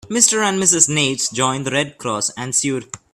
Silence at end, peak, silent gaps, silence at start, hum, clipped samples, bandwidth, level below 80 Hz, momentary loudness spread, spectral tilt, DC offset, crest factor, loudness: 0.15 s; 0 dBFS; none; 0.05 s; none; under 0.1%; 16 kHz; -56 dBFS; 9 LU; -2 dB/octave; under 0.1%; 18 dB; -16 LUFS